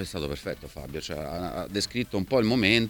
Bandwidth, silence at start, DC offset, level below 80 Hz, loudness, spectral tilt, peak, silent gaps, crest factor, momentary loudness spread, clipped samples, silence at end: 19 kHz; 0 s; under 0.1%; -48 dBFS; -29 LUFS; -5 dB/octave; -6 dBFS; none; 22 dB; 14 LU; under 0.1%; 0 s